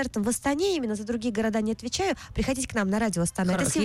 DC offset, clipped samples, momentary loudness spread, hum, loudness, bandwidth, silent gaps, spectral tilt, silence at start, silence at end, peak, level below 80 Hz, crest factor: under 0.1%; under 0.1%; 4 LU; none; -27 LUFS; 16.5 kHz; none; -4.5 dB/octave; 0 s; 0 s; -16 dBFS; -46 dBFS; 10 dB